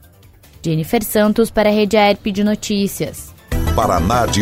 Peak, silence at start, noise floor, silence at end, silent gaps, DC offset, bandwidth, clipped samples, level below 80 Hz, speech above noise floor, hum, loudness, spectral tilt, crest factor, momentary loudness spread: 0 dBFS; 0.65 s; -45 dBFS; 0 s; none; under 0.1%; 16 kHz; under 0.1%; -30 dBFS; 30 dB; none; -16 LUFS; -5 dB/octave; 16 dB; 11 LU